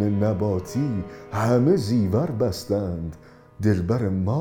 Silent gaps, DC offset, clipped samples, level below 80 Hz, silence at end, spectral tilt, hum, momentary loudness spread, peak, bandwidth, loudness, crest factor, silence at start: none; under 0.1%; under 0.1%; -48 dBFS; 0 s; -8 dB/octave; none; 10 LU; -8 dBFS; 17 kHz; -24 LUFS; 16 dB; 0 s